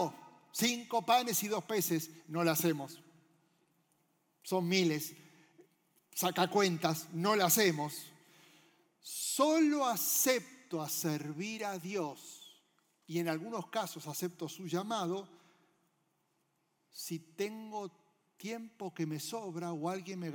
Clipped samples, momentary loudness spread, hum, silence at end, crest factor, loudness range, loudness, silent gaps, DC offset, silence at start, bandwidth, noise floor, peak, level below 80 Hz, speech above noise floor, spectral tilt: under 0.1%; 15 LU; none; 0 s; 20 dB; 10 LU; -34 LUFS; none; under 0.1%; 0 s; 19 kHz; -79 dBFS; -16 dBFS; under -90 dBFS; 44 dB; -3.5 dB/octave